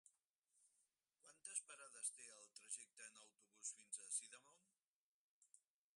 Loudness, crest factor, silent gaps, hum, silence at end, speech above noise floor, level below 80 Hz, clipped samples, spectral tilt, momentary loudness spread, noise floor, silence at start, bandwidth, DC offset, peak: -52 LUFS; 26 dB; 0.24-0.44 s, 4.82-5.42 s; none; 0.35 s; over 34 dB; under -90 dBFS; under 0.1%; 2.5 dB/octave; 14 LU; under -90 dBFS; 0.05 s; 11.5 kHz; under 0.1%; -32 dBFS